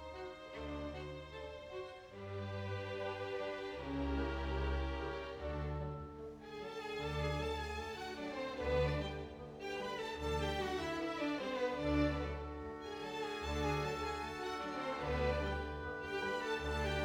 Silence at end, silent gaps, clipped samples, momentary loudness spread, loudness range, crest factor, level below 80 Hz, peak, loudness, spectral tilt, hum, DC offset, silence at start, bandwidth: 0 s; none; under 0.1%; 11 LU; 4 LU; 18 dB; -50 dBFS; -22 dBFS; -41 LUFS; -6 dB/octave; none; under 0.1%; 0 s; 17.5 kHz